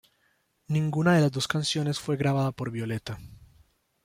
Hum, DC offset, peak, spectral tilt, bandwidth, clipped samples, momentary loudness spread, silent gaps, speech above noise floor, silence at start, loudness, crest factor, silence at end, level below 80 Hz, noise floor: none; under 0.1%; -10 dBFS; -5.5 dB/octave; 15.5 kHz; under 0.1%; 11 LU; none; 44 dB; 0.7 s; -27 LUFS; 18 dB; 0.7 s; -60 dBFS; -70 dBFS